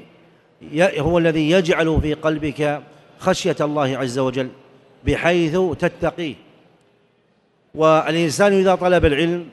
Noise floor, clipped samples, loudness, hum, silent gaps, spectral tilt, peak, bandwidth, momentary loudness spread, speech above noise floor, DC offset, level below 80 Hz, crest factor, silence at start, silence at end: -61 dBFS; under 0.1%; -19 LUFS; none; none; -5.5 dB/octave; -2 dBFS; 12 kHz; 10 LU; 43 dB; under 0.1%; -38 dBFS; 18 dB; 0.6 s; 0 s